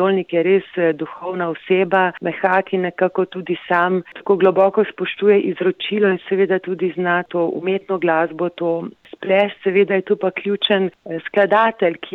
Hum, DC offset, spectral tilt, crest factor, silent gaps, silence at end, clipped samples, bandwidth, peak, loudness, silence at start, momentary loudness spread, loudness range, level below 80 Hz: none; under 0.1%; -8 dB/octave; 14 dB; none; 0.05 s; under 0.1%; 4.1 kHz; -4 dBFS; -18 LUFS; 0 s; 8 LU; 2 LU; -70 dBFS